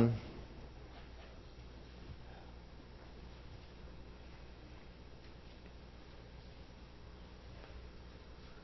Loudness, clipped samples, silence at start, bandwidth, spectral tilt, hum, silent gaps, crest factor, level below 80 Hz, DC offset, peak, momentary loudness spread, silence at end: -51 LUFS; under 0.1%; 0 s; 6 kHz; -7 dB/octave; none; none; 28 dB; -56 dBFS; under 0.1%; -18 dBFS; 3 LU; 0 s